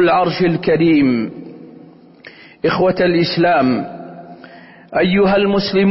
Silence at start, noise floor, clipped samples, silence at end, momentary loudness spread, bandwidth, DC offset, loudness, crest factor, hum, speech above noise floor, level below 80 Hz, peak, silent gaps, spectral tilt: 0 s; -42 dBFS; under 0.1%; 0 s; 19 LU; 5.8 kHz; under 0.1%; -15 LUFS; 12 dB; none; 28 dB; -48 dBFS; -4 dBFS; none; -10 dB/octave